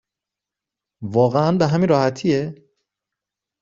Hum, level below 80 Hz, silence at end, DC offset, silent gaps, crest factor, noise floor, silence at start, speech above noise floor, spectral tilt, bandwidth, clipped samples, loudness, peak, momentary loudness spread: none; -58 dBFS; 1.1 s; under 0.1%; none; 18 dB; -86 dBFS; 1 s; 69 dB; -7.5 dB/octave; 7.6 kHz; under 0.1%; -19 LUFS; -4 dBFS; 9 LU